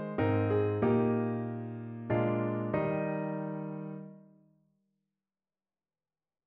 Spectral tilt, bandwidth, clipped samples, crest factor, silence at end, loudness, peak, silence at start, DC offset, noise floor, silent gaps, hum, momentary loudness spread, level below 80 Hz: -8.5 dB/octave; 4.1 kHz; under 0.1%; 16 dB; 2.25 s; -32 LUFS; -18 dBFS; 0 s; under 0.1%; under -90 dBFS; none; none; 13 LU; -64 dBFS